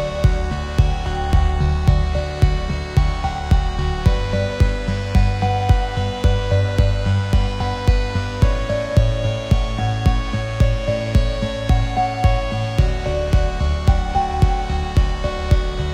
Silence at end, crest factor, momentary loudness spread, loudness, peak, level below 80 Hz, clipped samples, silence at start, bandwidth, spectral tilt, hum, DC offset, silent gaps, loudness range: 0 s; 16 dB; 4 LU; -20 LUFS; -2 dBFS; -20 dBFS; under 0.1%; 0 s; 10.5 kHz; -6.5 dB/octave; none; under 0.1%; none; 1 LU